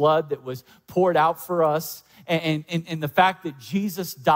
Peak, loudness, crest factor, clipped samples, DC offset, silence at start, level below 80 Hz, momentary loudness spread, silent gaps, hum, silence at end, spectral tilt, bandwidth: -6 dBFS; -23 LUFS; 18 dB; under 0.1%; under 0.1%; 0 s; -64 dBFS; 14 LU; none; none; 0 s; -5.5 dB/octave; 16.5 kHz